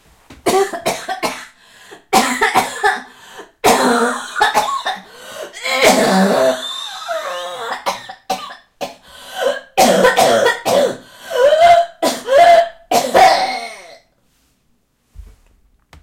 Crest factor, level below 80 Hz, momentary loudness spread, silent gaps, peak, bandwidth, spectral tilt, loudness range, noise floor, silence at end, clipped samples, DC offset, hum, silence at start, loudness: 16 dB; -50 dBFS; 19 LU; none; 0 dBFS; 16.5 kHz; -3 dB/octave; 6 LU; -62 dBFS; 0.8 s; under 0.1%; under 0.1%; none; 0.3 s; -15 LUFS